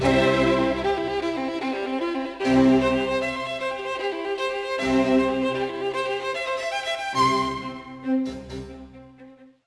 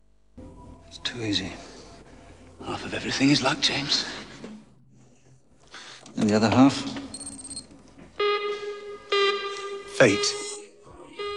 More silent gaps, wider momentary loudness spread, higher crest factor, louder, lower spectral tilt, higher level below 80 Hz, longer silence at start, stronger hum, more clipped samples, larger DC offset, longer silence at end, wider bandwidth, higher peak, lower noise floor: neither; second, 10 LU vs 24 LU; second, 16 dB vs 22 dB; about the same, -24 LUFS vs -25 LUFS; first, -5.5 dB/octave vs -4 dB/octave; first, -46 dBFS vs -56 dBFS; second, 0 s vs 0.35 s; neither; neither; second, under 0.1% vs 0.1%; first, 0.2 s vs 0 s; about the same, 11 kHz vs 11 kHz; second, -8 dBFS vs -4 dBFS; second, -48 dBFS vs -58 dBFS